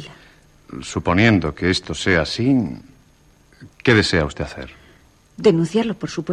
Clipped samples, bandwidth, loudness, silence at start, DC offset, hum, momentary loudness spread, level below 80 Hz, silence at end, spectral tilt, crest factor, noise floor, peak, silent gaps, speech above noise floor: under 0.1%; 11 kHz; -19 LUFS; 0 s; under 0.1%; none; 20 LU; -42 dBFS; 0 s; -5.5 dB/octave; 18 dB; -53 dBFS; -4 dBFS; none; 35 dB